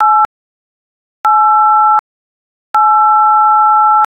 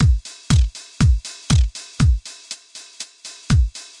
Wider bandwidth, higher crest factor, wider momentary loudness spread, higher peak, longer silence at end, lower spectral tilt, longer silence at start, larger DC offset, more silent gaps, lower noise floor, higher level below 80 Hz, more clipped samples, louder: second, 5.4 kHz vs 11.5 kHz; second, 10 dB vs 16 dB; second, 7 LU vs 15 LU; about the same, -2 dBFS vs -4 dBFS; about the same, 0.05 s vs 0.15 s; second, -2 dB/octave vs -5 dB/octave; about the same, 0 s vs 0 s; neither; first, 0.25-1.24 s, 1.99-2.74 s vs none; first, under -90 dBFS vs -38 dBFS; second, -64 dBFS vs -22 dBFS; neither; first, -9 LUFS vs -20 LUFS